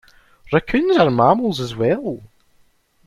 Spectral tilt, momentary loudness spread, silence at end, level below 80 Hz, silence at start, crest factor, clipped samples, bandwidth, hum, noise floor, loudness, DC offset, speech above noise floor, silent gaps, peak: -7 dB/octave; 10 LU; 0.8 s; -48 dBFS; 0.5 s; 18 dB; under 0.1%; 13.5 kHz; none; -57 dBFS; -18 LUFS; under 0.1%; 40 dB; none; -2 dBFS